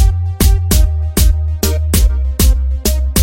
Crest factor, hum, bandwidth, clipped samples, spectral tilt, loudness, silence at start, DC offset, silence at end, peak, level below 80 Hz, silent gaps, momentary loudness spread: 12 dB; none; 17 kHz; under 0.1%; -5 dB/octave; -14 LUFS; 0 s; under 0.1%; 0 s; 0 dBFS; -12 dBFS; none; 3 LU